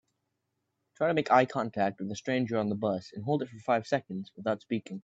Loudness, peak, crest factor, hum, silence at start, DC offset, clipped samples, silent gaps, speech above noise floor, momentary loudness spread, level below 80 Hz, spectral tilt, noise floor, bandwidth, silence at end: -30 LUFS; -8 dBFS; 22 dB; none; 1 s; under 0.1%; under 0.1%; none; 52 dB; 11 LU; -74 dBFS; -6.5 dB/octave; -82 dBFS; 8 kHz; 0.05 s